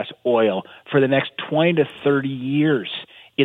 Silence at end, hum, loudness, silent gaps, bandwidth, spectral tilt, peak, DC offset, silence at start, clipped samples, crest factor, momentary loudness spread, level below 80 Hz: 0 s; none; -20 LUFS; none; 4.2 kHz; -8.5 dB/octave; -4 dBFS; under 0.1%; 0 s; under 0.1%; 16 dB; 11 LU; -66 dBFS